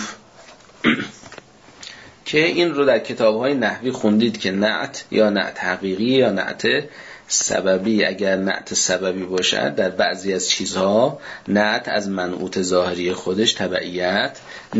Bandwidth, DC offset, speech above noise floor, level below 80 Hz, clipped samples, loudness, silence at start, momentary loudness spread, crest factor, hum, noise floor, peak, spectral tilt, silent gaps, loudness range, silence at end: 8 kHz; under 0.1%; 26 dB; -60 dBFS; under 0.1%; -19 LUFS; 0 s; 7 LU; 16 dB; none; -46 dBFS; -4 dBFS; -3.5 dB/octave; none; 1 LU; 0 s